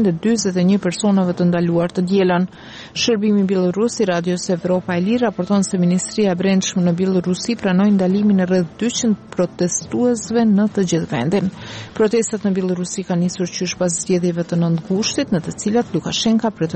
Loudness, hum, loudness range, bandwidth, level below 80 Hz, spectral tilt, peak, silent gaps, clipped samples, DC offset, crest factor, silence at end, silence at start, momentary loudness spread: -18 LUFS; none; 3 LU; 8.8 kHz; -52 dBFS; -5.5 dB/octave; -6 dBFS; none; under 0.1%; under 0.1%; 10 dB; 0 s; 0 s; 5 LU